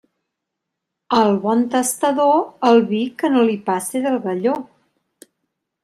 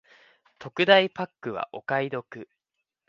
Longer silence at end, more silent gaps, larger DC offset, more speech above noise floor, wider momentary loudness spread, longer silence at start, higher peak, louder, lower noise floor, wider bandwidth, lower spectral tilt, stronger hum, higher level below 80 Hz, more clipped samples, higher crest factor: first, 1.2 s vs 0.65 s; neither; neither; first, 63 dB vs 58 dB; second, 7 LU vs 25 LU; first, 1.1 s vs 0.6 s; about the same, -2 dBFS vs -2 dBFS; first, -18 LUFS vs -25 LUFS; about the same, -80 dBFS vs -83 dBFS; first, 15 kHz vs 7.2 kHz; second, -4.5 dB/octave vs -6 dB/octave; neither; first, -68 dBFS vs -74 dBFS; neither; second, 16 dB vs 24 dB